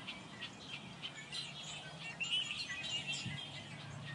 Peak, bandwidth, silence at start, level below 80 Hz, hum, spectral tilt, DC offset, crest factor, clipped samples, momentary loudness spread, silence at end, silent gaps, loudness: -28 dBFS; 11.5 kHz; 0 s; -74 dBFS; none; -2 dB/octave; under 0.1%; 18 dB; under 0.1%; 11 LU; 0 s; none; -42 LUFS